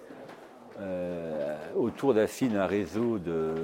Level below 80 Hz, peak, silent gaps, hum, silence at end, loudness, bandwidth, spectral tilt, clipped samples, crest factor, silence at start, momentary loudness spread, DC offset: -62 dBFS; -12 dBFS; none; none; 0 s; -30 LUFS; 16.5 kHz; -6.5 dB/octave; under 0.1%; 18 dB; 0 s; 20 LU; under 0.1%